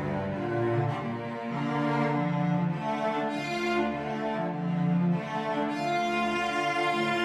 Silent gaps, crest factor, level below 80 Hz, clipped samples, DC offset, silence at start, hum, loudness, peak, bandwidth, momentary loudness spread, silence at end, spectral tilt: none; 12 dB; -60 dBFS; under 0.1%; under 0.1%; 0 s; none; -29 LUFS; -16 dBFS; 11.5 kHz; 5 LU; 0 s; -6.5 dB/octave